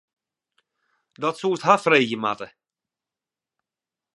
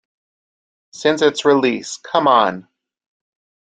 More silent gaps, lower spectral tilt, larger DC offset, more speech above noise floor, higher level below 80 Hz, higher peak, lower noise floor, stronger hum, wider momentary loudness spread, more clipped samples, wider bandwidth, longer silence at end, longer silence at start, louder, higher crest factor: neither; about the same, -4.5 dB/octave vs -4 dB/octave; neither; second, 68 dB vs over 74 dB; second, -76 dBFS vs -66 dBFS; about the same, -2 dBFS vs 0 dBFS; about the same, -90 dBFS vs under -90 dBFS; neither; first, 14 LU vs 8 LU; neither; first, 11.5 kHz vs 9.4 kHz; first, 1.7 s vs 1.05 s; first, 1.2 s vs 0.95 s; second, -21 LUFS vs -16 LUFS; first, 24 dB vs 18 dB